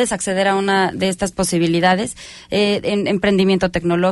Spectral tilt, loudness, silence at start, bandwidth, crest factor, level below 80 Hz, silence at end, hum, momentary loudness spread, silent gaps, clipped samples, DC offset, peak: -4.5 dB/octave; -17 LUFS; 0 s; 12 kHz; 14 dB; -44 dBFS; 0 s; none; 5 LU; none; under 0.1%; under 0.1%; -4 dBFS